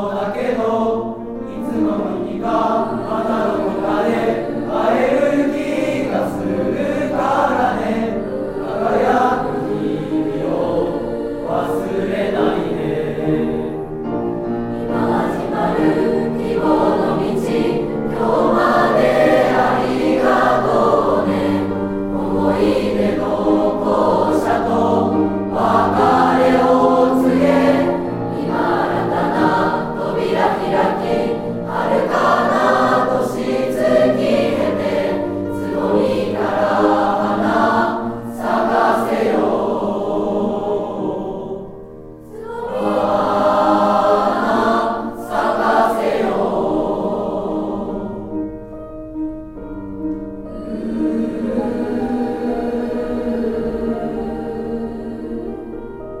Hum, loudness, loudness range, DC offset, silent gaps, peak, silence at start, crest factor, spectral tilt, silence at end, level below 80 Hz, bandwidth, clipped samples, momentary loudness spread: none; -18 LUFS; 7 LU; under 0.1%; none; 0 dBFS; 0 s; 16 dB; -7 dB/octave; 0 s; -42 dBFS; 16 kHz; under 0.1%; 11 LU